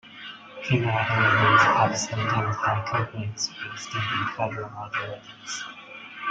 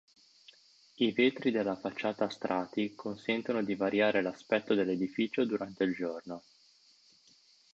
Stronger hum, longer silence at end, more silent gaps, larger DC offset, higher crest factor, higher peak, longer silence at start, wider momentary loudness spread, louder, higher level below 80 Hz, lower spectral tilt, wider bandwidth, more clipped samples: neither; second, 0 s vs 1.35 s; neither; neither; about the same, 20 dB vs 18 dB; first, -6 dBFS vs -16 dBFS; second, 0.05 s vs 1 s; first, 20 LU vs 9 LU; first, -24 LUFS vs -32 LUFS; first, -58 dBFS vs -74 dBFS; second, -4 dB/octave vs -6 dB/octave; first, 9.2 kHz vs 7.8 kHz; neither